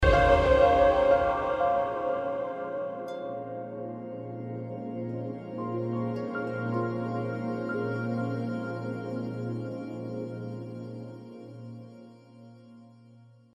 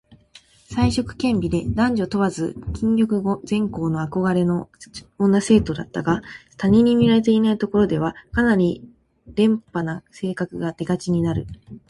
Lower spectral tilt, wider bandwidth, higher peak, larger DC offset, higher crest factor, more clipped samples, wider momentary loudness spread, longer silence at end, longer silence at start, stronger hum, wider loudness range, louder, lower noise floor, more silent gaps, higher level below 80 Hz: about the same, -7.5 dB/octave vs -7 dB/octave; second, 8.8 kHz vs 11.5 kHz; second, -8 dBFS vs -4 dBFS; neither; about the same, 20 dB vs 16 dB; neither; first, 18 LU vs 12 LU; first, 0.35 s vs 0.1 s; second, 0 s vs 0.7 s; neither; first, 13 LU vs 4 LU; second, -29 LUFS vs -21 LUFS; first, -55 dBFS vs -51 dBFS; neither; about the same, -42 dBFS vs -42 dBFS